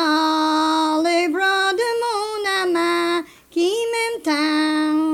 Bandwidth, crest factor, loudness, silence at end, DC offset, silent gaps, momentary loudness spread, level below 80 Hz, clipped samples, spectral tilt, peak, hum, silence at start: 15.5 kHz; 10 dB; -19 LUFS; 0 s; under 0.1%; none; 5 LU; -64 dBFS; under 0.1%; -2 dB/octave; -8 dBFS; none; 0 s